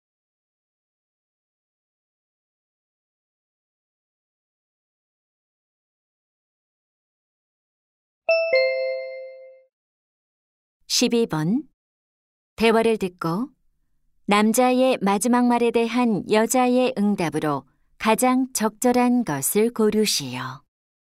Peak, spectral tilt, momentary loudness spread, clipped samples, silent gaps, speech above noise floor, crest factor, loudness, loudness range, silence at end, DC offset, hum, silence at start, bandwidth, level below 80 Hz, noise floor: -4 dBFS; -4 dB/octave; 12 LU; under 0.1%; 9.73-10.80 s, 11.74-12.57 s; 45 dB; 20 dB; -21 LUFS; 7 LU; 0.55 s; under 0.1%; none; 8.3 s; 16 kHz; -62 dBFS; -65 dBFS